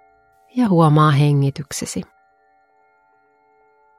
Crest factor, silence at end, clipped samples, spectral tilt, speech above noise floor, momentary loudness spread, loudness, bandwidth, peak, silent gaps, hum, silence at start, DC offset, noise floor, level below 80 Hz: 18 dB; 1.95 s; under 0.1%; -6.5 dB/octave; 42 dB; 15 LU; -17 LUFS; 14 kHz; -2 dBFS; none; none; 0.55 s; under 0.1%; -58 dBFS; -56 dBFS